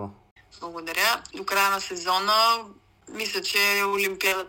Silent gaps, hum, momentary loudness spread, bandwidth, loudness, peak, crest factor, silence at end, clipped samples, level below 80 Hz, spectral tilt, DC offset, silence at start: 0.31-0.36 s; none; 17 LU; 16.5 kHz; -23 LUFS; -8 dBFS; 18 dB; 0 s; under 0.1%; -64 dBFS; -1 dB/octave; under 0.1%; 0 s